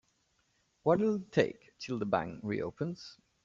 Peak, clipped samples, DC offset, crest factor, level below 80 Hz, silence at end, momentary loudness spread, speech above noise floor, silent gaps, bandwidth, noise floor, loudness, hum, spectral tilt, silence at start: -12 dBFS; under 0.1%; under 0.1%; 22 dB; -68 dBFS; 0.3 s; 14 LU; 42 dB; none; 7.6 kHz; -75 dBFS; -33 LUFS; none; -7 dB/octave; 0.85 s